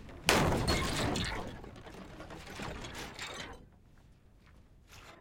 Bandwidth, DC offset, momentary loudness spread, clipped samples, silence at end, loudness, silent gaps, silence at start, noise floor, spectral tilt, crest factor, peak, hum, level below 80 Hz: 16.5 kHz; under 0.1%; 21 LU; under 0.1%; 0 s; -34 LUFS; none; 0 s; -60 dBFS; -4 dB/octave; 30 dB; -6 dBFS; none; -48 dBFS